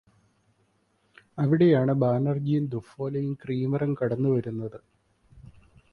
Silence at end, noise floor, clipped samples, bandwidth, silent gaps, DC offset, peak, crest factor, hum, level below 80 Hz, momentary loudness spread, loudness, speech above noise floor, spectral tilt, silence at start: 0.5 s; -69 dBFS; under 0.1%; 4.7 kHz; none; under 0.1%; -10 dBFS; 18 dB; none; -62 dBFS; 13 LU; -26 LUFS; 44 dB; -10.5 dB/octave; 1.35 s